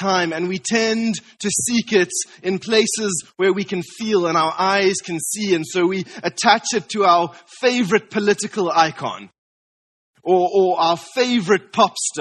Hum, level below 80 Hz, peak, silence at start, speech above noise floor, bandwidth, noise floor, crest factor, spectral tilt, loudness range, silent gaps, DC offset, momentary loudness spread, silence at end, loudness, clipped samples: none; -64 dBFS; 0 dBFS; 0 s; over 71 dB; 12 kHz; under -90 dBFS; 20 dB; -3.5 dB/octave; 2 LU; 9.38-10.14 s; under 0.1%; 8 LU; 0 s; -19 LUFS; under 0.1%